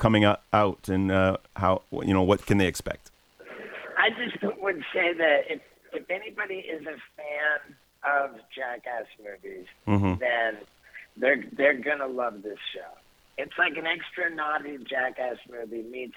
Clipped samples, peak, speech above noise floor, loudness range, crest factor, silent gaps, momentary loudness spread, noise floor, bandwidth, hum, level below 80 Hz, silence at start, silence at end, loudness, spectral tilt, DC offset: under 0.1%; -6 dBFS; 19 dB; 5 LU; 22 dB; none; 17 LU; -47 dBFS; 16.5 kHz; none; -54 dBFS; 0 s; 0 s; -27 LUFS; -6 dB/octave; under 0.1%